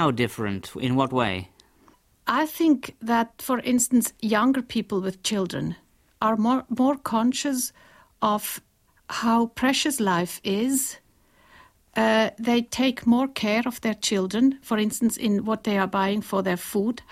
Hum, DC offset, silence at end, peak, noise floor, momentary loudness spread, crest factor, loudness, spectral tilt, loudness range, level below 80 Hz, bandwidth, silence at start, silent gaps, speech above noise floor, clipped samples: none; under 0.1%; 0.1 s; -6 dBFS; -59 dBFS; 7 LU; 18 dB; -24 LUFS; -4 dB/octave; 2 LU; -60 dBFS; 16 kHz; 0 s; none; 36 dB; under 0.1%